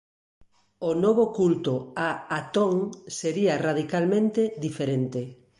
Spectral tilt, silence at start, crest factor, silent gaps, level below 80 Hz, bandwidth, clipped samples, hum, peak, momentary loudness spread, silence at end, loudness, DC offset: -6 dB/octave; 0.8 s; 16 dB; none; -66 dBFS; 11.5 kHz; under 0.1%; none; -10 dBFS; 9 LU; 0.25 s; -26 LUFS; under 0.1%